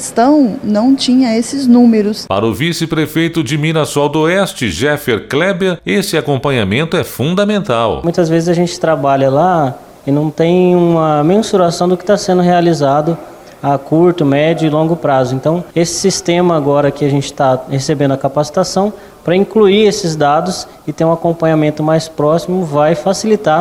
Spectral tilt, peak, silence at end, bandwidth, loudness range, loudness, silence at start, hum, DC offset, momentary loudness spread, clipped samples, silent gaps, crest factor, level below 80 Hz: -5.5 dB/octave; 0 dBFS; 0 s; 16.5 kHz; 2 LU; -12 LUFS; 0 s; none; under 0.1%; 6 LU; under 0.1%; none; 12 dB; -44 dBFS